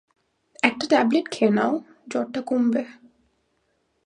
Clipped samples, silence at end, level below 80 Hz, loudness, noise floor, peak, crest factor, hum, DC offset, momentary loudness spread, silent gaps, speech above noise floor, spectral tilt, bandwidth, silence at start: under 0.1%; 1.15 s; -72 dBFS; -23 LUFS; -70 dBFS; -2 dBFS; 24 dB; none; under 0.1%; 10 LU; none; 48 dB; -5 dB/octave; 10.5 kHz; 0.65 s